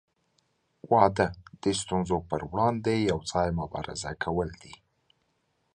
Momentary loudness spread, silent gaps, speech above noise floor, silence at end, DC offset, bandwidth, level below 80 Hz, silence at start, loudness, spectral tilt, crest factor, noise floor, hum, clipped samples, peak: 11 LU; none; 47 dB; 1 s; under 0.1%; 11 kHz; -50 dBFS; 0.9 s; -28 LUFS; -5.5 dB/octave; 24 dB; -74 dBFS; none; under 0.1%; -6 dBFS